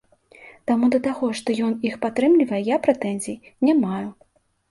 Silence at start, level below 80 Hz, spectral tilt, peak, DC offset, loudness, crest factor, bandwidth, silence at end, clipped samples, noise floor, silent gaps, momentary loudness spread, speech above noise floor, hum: 0.4 s; -64 dBFS; -6 dB/octave; -4 dBFS; under 0.1%; -22 LUFS; 18 dB; 11.5 kHz; 0.6 s; under 0.1%; -49 dBFS; none; 12 LU; 28 dB; none